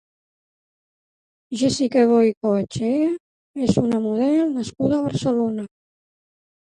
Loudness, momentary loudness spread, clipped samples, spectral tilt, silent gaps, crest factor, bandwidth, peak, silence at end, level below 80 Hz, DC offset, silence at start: -20 LUFS; 12 LU; under 0.1%; -6.5 dB/octave; 2.37-2.41 s, 3.20-3.54 s; 18 dB; 11 kHz; -4 dBFS; 0.95 s; -54 dBFS; under 0.1%; 1.5 s